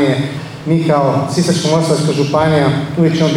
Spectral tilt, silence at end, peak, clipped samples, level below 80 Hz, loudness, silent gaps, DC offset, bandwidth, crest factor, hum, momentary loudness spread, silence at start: -6 dB/octave; 0 s; -2 dBFS; under 0.1%; -46 dBFS; -14 LUFS; none; under 0.1%; 12.5 kHz; 12 dB; none; 5 LU; 0 s